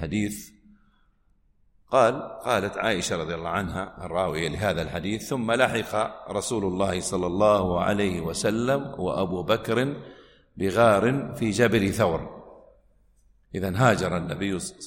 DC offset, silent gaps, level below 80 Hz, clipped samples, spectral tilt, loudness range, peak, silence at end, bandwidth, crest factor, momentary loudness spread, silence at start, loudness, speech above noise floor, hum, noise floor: under 0.1%; none; -50 dBFS; under 0.1%; -5 dB/octave; 3 LU; -4 dBFS; 0 s; 16.5 kHz; 20 dB; 9 LU; 0 s; -25 LUFS; 39 dB; none; -63 dBFS